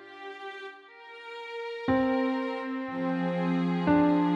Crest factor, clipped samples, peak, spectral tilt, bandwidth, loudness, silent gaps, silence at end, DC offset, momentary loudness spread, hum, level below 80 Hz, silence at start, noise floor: 16 dB; under 0.1%; -12 dBFS; -8.5 dB/octave; 7.4 kHz; -28 LUFS; none; 0 s; under 0.1%; 19 LU; none; -60 dBFS; 0 s; -48 dBFS